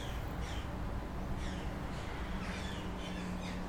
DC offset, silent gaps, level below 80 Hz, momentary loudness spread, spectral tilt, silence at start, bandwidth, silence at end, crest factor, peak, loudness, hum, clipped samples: under 0.1%; none; -44 dBFS; 1 LU; -5.5 dB/octave; 0 s; 17.5 kHz; 0 s; 14 dB; -26 dBFS; -41 LUFS; none; under 0.1%